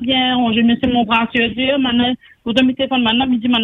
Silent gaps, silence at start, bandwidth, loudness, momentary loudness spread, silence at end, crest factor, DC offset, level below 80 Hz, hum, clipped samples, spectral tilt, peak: none; 0 s; 6.6 kHz; -15 LUFS; 3 LU; 0 s; 14 dB; under 0.1%; -46 dBFS; none; under 0.1%; -6 dB/octave; -2 dBFS